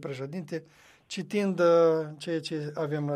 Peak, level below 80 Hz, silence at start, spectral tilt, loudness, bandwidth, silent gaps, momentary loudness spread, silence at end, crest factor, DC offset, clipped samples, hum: -12 dBFS; -76 dBFS; 0 s; -6.5 dB/octave; -28 LUFS; 11 kHz; none; 16 LU; 0 s; 16 dB; under 0.1%; under 0.1%; none